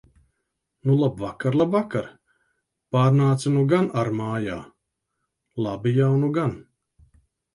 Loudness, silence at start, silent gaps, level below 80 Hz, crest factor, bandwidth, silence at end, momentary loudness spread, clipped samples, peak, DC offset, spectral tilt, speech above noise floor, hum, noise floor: -23 LUFS; 0.85 s; none; -58 dBFS; 18 dB; 11.5 kHz; 0.95 s; 11 LU; under 0.1%; -6 dBFS; under 0.1%; -8 dB/octave; 57 dB; none; -79 dBFS